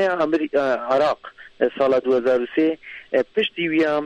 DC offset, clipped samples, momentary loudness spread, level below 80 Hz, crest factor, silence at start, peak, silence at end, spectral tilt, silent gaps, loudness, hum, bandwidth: under 0.1%; under 0.1%; 5 LU; -62 dBFS; 16 dB; 0 s; -4 dBFS; 0 s; -6 dB/octave; none; -21 LUFS; none; 8.6 kHz